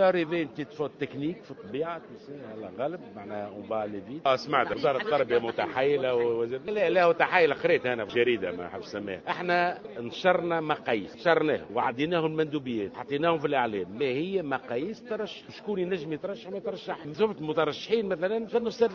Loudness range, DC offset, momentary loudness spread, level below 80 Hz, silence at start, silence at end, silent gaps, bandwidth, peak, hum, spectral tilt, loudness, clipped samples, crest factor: 7 LU; under 0.1%; 12 LU; -66 dBFS; 0 s; 0 s; none; 7 kHz; -6 dBFS; none; -6.5 dB/octave; -28 LUFS; under 0.1%; 22 dB